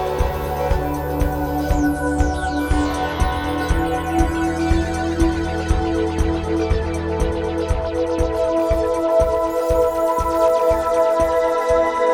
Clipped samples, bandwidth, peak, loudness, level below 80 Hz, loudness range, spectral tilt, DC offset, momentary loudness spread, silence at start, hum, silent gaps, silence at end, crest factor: under 0.1%; 17.5 kHz; -4 dBFS; -20 LUFS; -26 dBFS; 3 LU; -6.5 dB/octave; under 0.1%; 5 LU; 0 s; none; none; 0 s; 14 dB